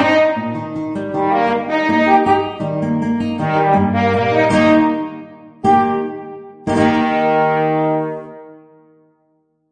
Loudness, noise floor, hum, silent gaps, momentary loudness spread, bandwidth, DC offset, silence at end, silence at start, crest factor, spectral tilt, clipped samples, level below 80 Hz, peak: -16 LUFS; -62 dBFS; none; none; 12 LU; 9.6 kHz; under 0.1%; 1.2 s; 0 s; 16 dB; -7 dB/octave; under 0.1%; -50 dBFS; 0 dBFS